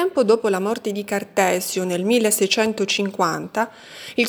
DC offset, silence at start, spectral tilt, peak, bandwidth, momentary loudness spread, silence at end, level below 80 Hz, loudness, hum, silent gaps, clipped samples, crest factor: under 0.1%; 0 s; -3.5 dB/octave; -4 dBFS; over 20 kHz; 8 LU; 0 s; -68 dBFS; -20 LUFS; none; none; under 0.1%; 18 dB